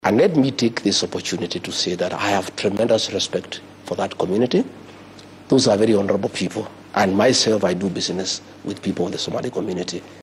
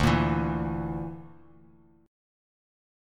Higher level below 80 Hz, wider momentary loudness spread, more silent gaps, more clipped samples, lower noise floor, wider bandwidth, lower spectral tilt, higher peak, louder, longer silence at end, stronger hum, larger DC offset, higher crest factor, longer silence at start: second, -60 dBFS vs -42 dBFS; second, 12 LU vs 15 LU; neither; neither; second, -42 dBFS vs -58 dBFS; about the same, 14 kHz vs 14 kHz; second, -4 dB/octave vs -7 dB/octave; first, -6 dBFS vs -10 dBFS; first, -20 LUFS vs -29 LUFS; second, 0 s vs 1.75 s; neither; neither; about the same, 16 dB vs 20 dB; about the same, 0.05 s vs 0 s